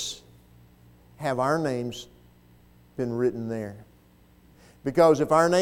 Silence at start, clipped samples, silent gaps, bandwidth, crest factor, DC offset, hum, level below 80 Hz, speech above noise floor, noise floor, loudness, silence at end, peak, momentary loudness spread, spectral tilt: 0 s; under 0.1%; none; 16.5 kHz; 20 dB; under 0.1%; 60 Hz at -55 dBFS; -60 dBFS; 33 dB; -57 dBFS; -25 LUFS; 0 s; -6 dBFS; 20 LU; -5.5 dB/octave